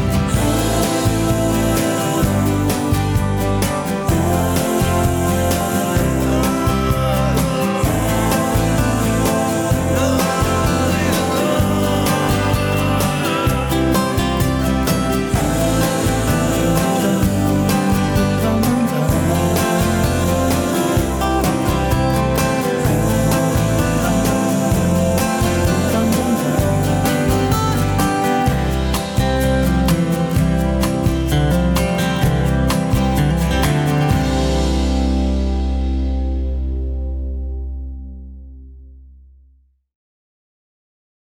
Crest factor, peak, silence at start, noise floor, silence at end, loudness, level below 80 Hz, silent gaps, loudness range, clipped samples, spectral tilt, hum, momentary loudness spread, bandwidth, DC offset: 10 dB; -6 dBFS; 0 s; -54 dBFS; 2.2 s; -17 LUFS; -26 dBFS; none; 2 LU; under 0.1%; -5.5 dB/octave; none; 2 LU; over 20 kHz; under 0.1%